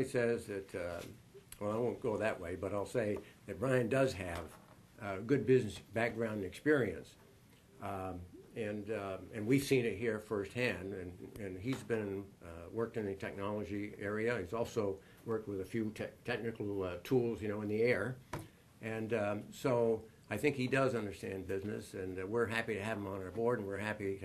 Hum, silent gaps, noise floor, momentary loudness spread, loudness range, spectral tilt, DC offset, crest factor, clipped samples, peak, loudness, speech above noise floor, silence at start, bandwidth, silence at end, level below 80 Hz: none; none; -63 dBFS; 13 LU; 4 LU; -6.5 dB/octave; under 0.1%; 20 dB; under 0.1%; -18 dBFS; -37 LUFS; 26 dB; 0 s; 13 kHz; 0 s; -66 dBFS